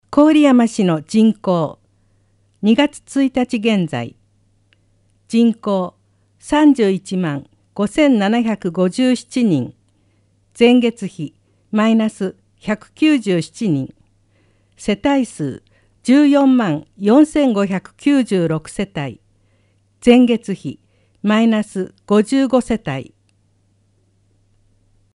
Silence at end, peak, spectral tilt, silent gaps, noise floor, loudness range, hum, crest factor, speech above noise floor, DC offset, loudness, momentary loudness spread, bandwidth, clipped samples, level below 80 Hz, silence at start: 2.1 s; 0 dBFS; -6 dB/octave; none; -59 dBFS; 5 LU; none; 16 dB; 44 dB; under 0.1%; -16 LUFS; 14 LU; 11.5 kHz; under 0.1%; -52 dBFS; 0.1 s